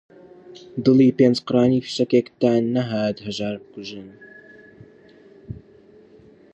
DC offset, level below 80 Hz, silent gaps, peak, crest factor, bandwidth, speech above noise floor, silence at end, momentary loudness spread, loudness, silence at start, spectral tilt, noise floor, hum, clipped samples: under 0.1%; -58 dBFS; none; -4 dBFS; 18 dB; 8.2 kHz; 30 dB; 1 s; 24 LU; -20 LUFS; 0.5 s; -7 dB/octave; -50 dBFS; none; under 0.1%